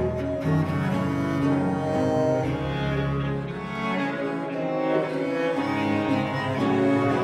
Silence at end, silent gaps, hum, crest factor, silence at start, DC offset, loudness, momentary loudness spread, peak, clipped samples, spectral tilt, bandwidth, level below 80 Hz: 0 s; none; none; 14 dB; 0 s; under 0.1%; -25 LUFS; 5 LU; -10 dBFS; under 0.1%; -7.5 dB/octave; 12 kHz; -46 dBFS